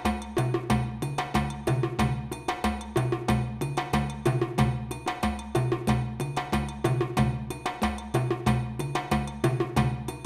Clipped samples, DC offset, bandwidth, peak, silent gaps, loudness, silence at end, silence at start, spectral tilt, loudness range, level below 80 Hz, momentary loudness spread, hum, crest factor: under 0.1%; under 0.1%; 13.5 kHz; -10 dBFS; none; -28 LUFS; 0 s; 0 s; -6.5 dB/octave; 1 LU; -40 dBFS; 5 LU; none; 16 dB